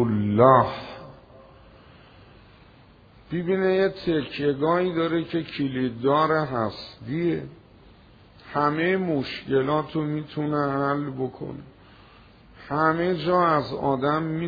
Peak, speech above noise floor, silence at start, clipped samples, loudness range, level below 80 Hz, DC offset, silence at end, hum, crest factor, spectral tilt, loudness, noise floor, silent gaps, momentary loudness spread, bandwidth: -2 dBFS; 29 dB; 0 s; under 0.1%; 4 LU; -56 dBFS; under 0.1%; 0 s; none; 22 dB; -9 dB/octave; -24 LUFS; -52 dBFS; none; 11 LU; 5 kHz